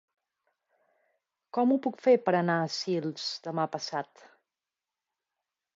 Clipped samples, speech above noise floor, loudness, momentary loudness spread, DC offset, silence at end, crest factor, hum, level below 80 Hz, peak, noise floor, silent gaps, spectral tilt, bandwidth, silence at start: under 0.1%; over 62 dB; -29 LUFS; 11 LU; under 0.1%; 1.75 s; 20 dB; none; -84 dBFS; -12 dBFS; under -90 dBFS; none; -5.5 dB/octave; 7.6 kHz; 1.55 s